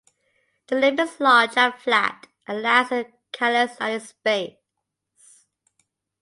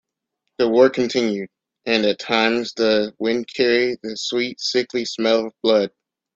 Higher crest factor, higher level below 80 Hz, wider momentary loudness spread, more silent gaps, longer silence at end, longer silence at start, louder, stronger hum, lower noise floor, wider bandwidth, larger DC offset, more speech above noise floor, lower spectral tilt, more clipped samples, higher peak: about the same, 20 dB vs 18 dB; second, -76 dBFS vs -62 dBFS; first, 12 LU vs 8 LU; neither; first, 1.7 s vs 0.5 s; about the same, 0.7 s vs 0.6 s; about the same, -21 LUFS vs -20 LUFS; neither; about the same, -81 dBFS vs -78 dBFS; first, 11.5 kHz vs 7.8 kHz; neither; about the same, 60 dB vs 59 dB; about the same, -3 dB/octave vs -4 dB/octave; neither; about the same, -4 dBFS vs -2 dBFS